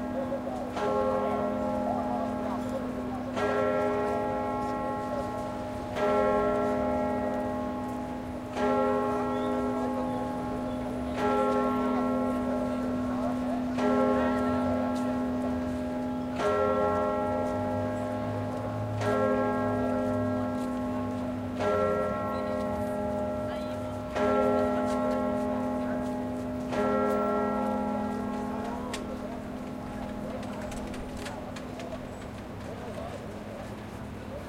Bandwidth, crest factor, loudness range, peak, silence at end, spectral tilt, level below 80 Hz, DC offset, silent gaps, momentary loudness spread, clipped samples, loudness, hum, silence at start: 15.5 kHz; 16 dB; 7 LU; -14 dBFS; 0 s; -7 dB/octave; -50 dBFS; under 0.1%; none; 11 LU; under 0.1%; -30 LUFS; none; 0 s